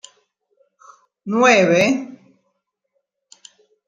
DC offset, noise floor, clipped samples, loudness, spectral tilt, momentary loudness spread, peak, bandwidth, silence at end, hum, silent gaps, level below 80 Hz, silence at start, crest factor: under 0.1%; -73 dBFS; under 0.1%; -15 LUFS; -4.5 dB/octave; 23 LU; 0 dBFS; 9.6 kHz; 1.7 s; none; none; -68 dBFS; 1.25 s; 20 dB